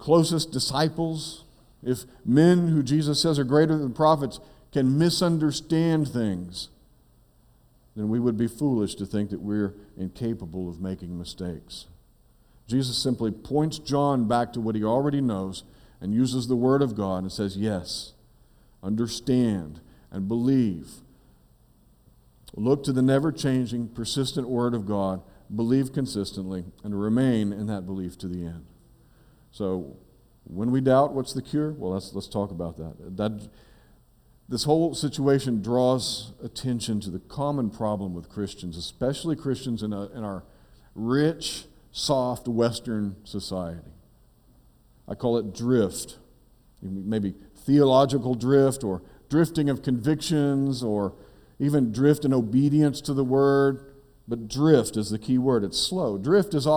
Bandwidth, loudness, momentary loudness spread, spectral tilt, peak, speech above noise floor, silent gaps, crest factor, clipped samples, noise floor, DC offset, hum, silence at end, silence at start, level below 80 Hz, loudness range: 18.5 kHz; -25 LUFS; 14 LU; -6 dB/octave; -6 dBFS; 34 dB; none; 20 dB; under 0.1%; -59 dBFS; under 0.1%; none; 0 s; 0 s; -52 dBFS; 7 LU